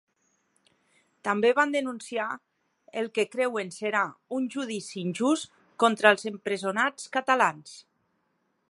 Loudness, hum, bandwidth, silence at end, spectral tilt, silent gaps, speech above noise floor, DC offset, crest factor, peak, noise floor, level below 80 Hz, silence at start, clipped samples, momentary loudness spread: -27 LUFS; none; 11.5 kHz; 0.9 s; -4 dB/octave; none; 47 dB; under 0.1%; 26 dB; -2 dBFS; -74 dBFS; -82 dBFS; 1.25 s; under 0.1%; 12 LU